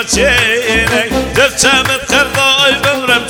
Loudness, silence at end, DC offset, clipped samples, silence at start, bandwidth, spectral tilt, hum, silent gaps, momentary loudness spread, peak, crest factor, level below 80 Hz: -10 LUFS; 0 s; under 0.1%; 0.3%; 0 s; over 20 kHz; -2 dB/octave; none; none; 4 LU; 0 dBFS; 12 dB; -30 dBFS